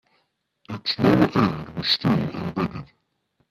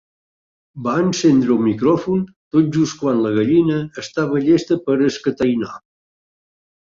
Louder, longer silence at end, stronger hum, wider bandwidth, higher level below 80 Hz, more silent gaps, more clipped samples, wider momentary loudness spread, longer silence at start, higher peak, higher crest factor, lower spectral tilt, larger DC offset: second, -22 LUFS vs -18 LUFS; second, 0.65 s vs 1.05 s; neither; first, 14 kHz vs 7.6 kHz; about the same, -52 dBFS vs -56 dBFS; second, none vs 2.36-2.51 s; neither; first, 11 LU vs 8 LU; about the same, 0.7 s vs 0.75 s; about the same, -4 dBFS vs -4 dBFS; first, 20 dB vs 14 dB; about the same, -7 dB/octave vs -6.5 dB/octave; neither